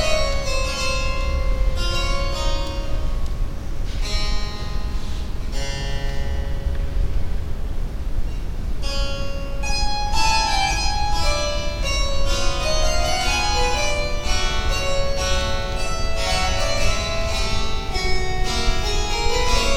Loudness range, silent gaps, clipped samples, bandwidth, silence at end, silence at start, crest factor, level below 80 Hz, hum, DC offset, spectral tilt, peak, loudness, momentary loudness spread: 7 LU; none; under 0.1%; 14.5 kHz; 0 s; 0 s; 14 dB; -22 dBFS; none; under 0.1%; -3.5 dB/octave; -4 dBFS; -24 LUFS; 10 LU